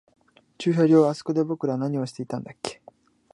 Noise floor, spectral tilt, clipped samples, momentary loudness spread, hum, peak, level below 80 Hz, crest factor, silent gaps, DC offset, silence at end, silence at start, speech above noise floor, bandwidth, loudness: -54 dBFS; -7 dB/octave; under 0.1%; 16 LU; none; -6 dBFS; -70 dBFS; 18 dB; none; under 0.1%; 0.6 s; 0.6 s; 31 dB; 11.5 kHz; -24 LUFS